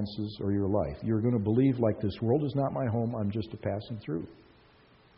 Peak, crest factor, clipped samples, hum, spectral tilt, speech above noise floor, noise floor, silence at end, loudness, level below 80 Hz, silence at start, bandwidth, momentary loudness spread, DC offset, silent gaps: -14 dBFS; 16 dB; under 0.1%; none; -8.5 dB/octave; 30 dB; -60 dBFS; 0.85 s; -30 LUFS; -56 dBFS; 0 s; 5.6 kHz; 10 LU; under 0.1%; none